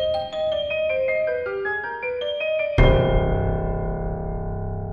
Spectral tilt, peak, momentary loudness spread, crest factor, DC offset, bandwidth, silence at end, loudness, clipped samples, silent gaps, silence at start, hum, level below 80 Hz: -8 dB/octave; -2 dBFS; 11 LU; 20 dB; under 0.1%; 6.8 kHz; 0 s; -23 LUFS; under 0.1%; none; 0 s; none; -28 dBFS